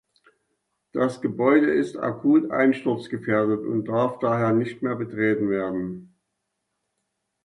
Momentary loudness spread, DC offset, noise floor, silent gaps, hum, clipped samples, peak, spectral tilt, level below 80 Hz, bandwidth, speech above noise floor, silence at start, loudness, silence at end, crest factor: 9 LU; under 0.1%; -79 dBFS; none; none; under 0.1%; -6 dBFS; -8 dB/octave; -64 dBFS; 10.5 kHz; 56 dB; 0.95 s; -23 LUFS; 1.4 s; 18 dB